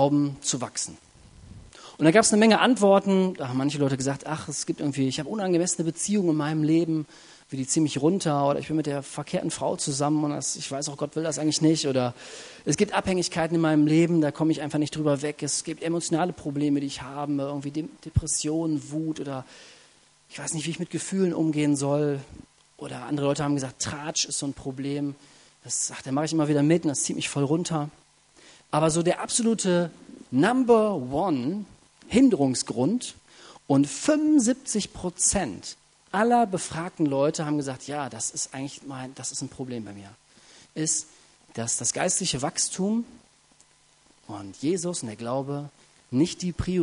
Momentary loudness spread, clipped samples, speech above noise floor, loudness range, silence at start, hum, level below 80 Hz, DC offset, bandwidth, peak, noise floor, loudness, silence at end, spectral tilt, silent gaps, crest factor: 14 LU; under 0.1%; 35 dB; 7 LU; 0 s; none; -54 dBFS; under 0.1%; 11 kHz; -4 dBFS; -60 dBFS; -25 LUFS; 0 s; -4.5 dB/octave; none; 22 dB